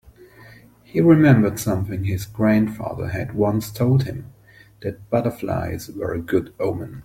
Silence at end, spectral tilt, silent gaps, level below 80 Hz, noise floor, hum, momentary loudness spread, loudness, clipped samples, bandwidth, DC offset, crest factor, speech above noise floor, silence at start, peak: 0 s; -7.5 dB/octave; none; -48 dBFS; -50 dBFS; none; 14 LU; -21 LUFS; under 0.1%; 16.5 kHz; under 0.1%; 18 dB; 30 dB; 0.2 s; -2 dBFS